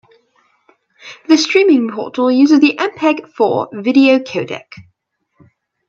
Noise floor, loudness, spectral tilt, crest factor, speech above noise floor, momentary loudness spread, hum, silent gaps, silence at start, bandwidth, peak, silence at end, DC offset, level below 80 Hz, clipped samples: -66 dBFS; -13 LUFS; -4.5 dB/octave; 14 dB; 54 dB; 12 LU; none; none; 1.05 s; 7.6 kHz; 0 dBFS; 1.05 s; under 0.1%; -66 dBFS; under 0.1%